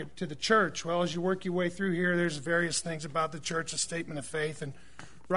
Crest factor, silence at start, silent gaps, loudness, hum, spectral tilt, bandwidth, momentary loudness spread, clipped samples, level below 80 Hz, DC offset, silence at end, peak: 20 dB; 0 s; none; -31 LUFS; none; -4 dB/octave; 11 kHz; 10 LU; under 0.1%; -62 dBFS; 0.5%; 0 s; -12 dBFS